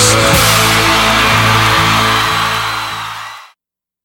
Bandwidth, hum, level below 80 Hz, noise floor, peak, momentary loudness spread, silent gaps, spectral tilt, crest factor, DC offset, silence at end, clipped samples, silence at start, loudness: 20 kHz; none; -30 dBFS; -84 dBFS; 0 dBFS; 13 LU; none; -2.5 dB/octave; 12 dB; under 0.1%; 0.6 s; under 0.1%; 0 s; -10 LUFS